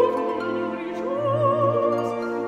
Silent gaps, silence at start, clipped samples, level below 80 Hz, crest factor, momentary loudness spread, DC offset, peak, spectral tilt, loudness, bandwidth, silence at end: none; 0 s; under 0.1%; -64 dBFS; 14 dB; 7 LU; under 0.1%; -8 dBFS; -8 dB/octave; -24 LUFS; 10.5 kHz; 0 s